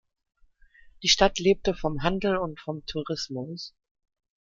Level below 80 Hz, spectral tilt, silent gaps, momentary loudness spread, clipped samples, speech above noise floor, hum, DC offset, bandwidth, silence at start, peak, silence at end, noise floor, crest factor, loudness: -46 dBFS; -3.5 dB/octave; none; 15 LU; under 0.1%; 31 dB; none; under 0.1%; 7.6 kHz; 1 s; -4 dBFS; 0.75 s; -57 dBFS; 24 dB; -26 LUFS